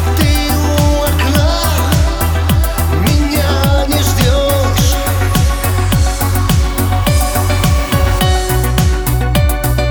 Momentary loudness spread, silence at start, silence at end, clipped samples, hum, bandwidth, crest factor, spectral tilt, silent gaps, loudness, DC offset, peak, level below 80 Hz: 2 LU; 0 s; 0 s; under 0.1%; none; over 20 kHz; 10 dB; -5 dB/octave; none; -13 LUFS; under 0.1%; 0 dBFS; -16 dBFS